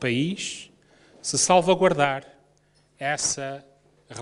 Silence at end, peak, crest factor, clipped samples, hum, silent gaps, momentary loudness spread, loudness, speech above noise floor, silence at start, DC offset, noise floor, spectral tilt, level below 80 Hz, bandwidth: 0 s; -4 dBFS; 22 dB; under 0.1%; none; none; 17 LU; -23 LUFS; 39 dB; 0 s; under 0.1%; -62 dBFS; -3.5 dB/octave; -62 dBFS; 11.5 kHz